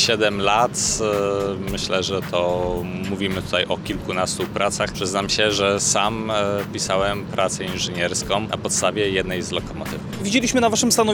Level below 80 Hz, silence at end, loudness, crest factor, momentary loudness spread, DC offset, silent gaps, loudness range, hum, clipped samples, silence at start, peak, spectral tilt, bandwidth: -42 dBFS; 0 s; -21 LUFS; 18 dB; 8 LU; under 0.1%; none; 2 LU; none; under 0.1%; 0 s; -4 dBFS; -3 dB/octave; 19.5 kHz